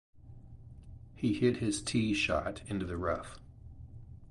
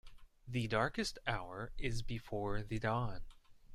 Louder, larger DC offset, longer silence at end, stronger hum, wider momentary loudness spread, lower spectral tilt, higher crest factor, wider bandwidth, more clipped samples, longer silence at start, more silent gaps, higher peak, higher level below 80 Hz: first, -33 LUFS vs -40 LUFS; neither; about the same, 0 s vs 0 s; neither; first, 23 LU vs 8 LU; about the same, -5 dB/octave vs -5.5 dB/octave; about the same, 18 dB vs 20 dB; second, 11.5 kHz vs 13.5 kHz; neither; about the same, 0.15 s vs 0.05 s; neither; first, -16 dBFS vs -20 dBFS; about the same, -52 dBFS vs -50 dBFS